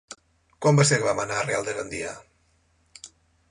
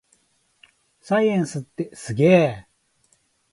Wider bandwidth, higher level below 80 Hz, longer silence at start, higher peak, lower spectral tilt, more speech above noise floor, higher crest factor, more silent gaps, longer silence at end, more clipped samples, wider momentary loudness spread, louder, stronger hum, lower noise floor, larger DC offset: about the same, 11.5 kHz vs 11.5 kHz; about the same, -58 dBFS vs -60 dBFS; second, 0.1 s vs 1.1 s; about the same, -6 dBFS vs -4 dBFS; second, -4.5 dB/octave vs -7 dB/octave; about the same, 42 dB vs 45 dB; about the same, 20 dB vs 20 dB; neither; second, 0.45 s vs 0.9 s; neither; first, 26 LU vs 16 LU; second, -24 LUFS vs -21 LUFS; neither; about the same, -65 dBFS vs -64 dBFS; neither